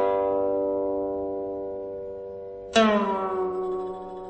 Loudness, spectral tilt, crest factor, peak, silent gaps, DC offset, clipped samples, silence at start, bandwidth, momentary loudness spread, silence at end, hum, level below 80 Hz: -26 LUFS; -5 dB/octave; 20 dB; -6 dBFS; none; under 0.1%; under 0.1%; 0 s; 8.6 kHz; 14 LU; 0 s; none; -56 dBFS